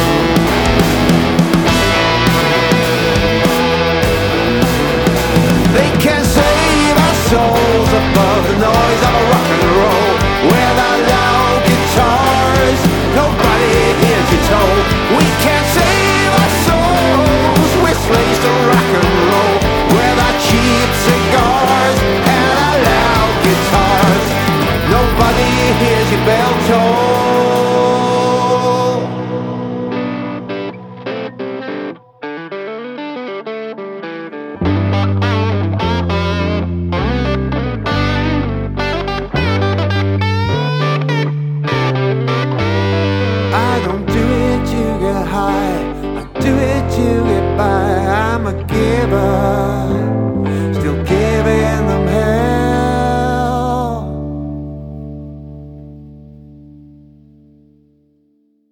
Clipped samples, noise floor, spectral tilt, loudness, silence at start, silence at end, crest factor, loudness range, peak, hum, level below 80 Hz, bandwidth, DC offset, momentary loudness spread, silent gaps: under 0.1%; -57 dBFS; -5.5 dB/octave; -13 LUFS; 0 s; 2 s; 12 dB; 9 LU; 0 dBFS; none; -26 dBFS; over 20 kHz; under 0.1%; 12 LU; none